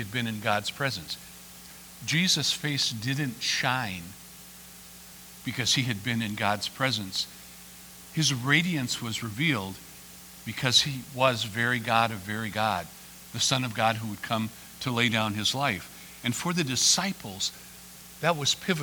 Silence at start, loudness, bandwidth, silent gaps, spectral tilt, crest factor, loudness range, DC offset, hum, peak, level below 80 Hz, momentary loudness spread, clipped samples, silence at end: 0 s; -27 LUFS; over 20 kHz; none; -3 dB/octave; 24 dB; 3 LU; under 0.1%; none; -6 dBFS; -60 dBFS; 22 LU; under 0.1%; 0 s